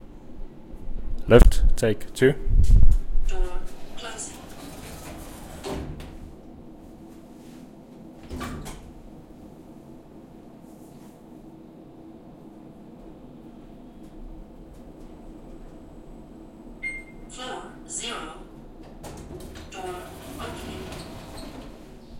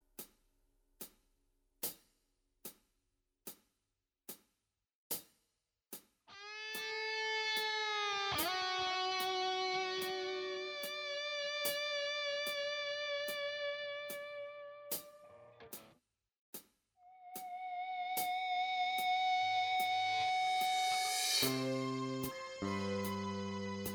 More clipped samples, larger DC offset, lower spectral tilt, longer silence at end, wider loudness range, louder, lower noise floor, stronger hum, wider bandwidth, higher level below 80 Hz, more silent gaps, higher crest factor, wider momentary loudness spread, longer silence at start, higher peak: neither; neither; first, -5.5 dB/octave vs -2.5 dB/octave; about the same, 0 s vs 0 s; first, 23 LU vs 16 LU; first, -27 LUFS vs -37 LUFS; second, -46 dBFS vs -89 dBFS; neither; second, 13.5 kHz vs over 20 kHz; first, -28 dBFS vs -76 dBFS; second, none vs 4.95-5.10 s, 16.39-16.53 s; first, 24 dB vs 18 dB; first, 24 LU vs 19 LU; about the same, 0.3 s vs 0.2 s; first, 0 dBFS vs -22 dBFS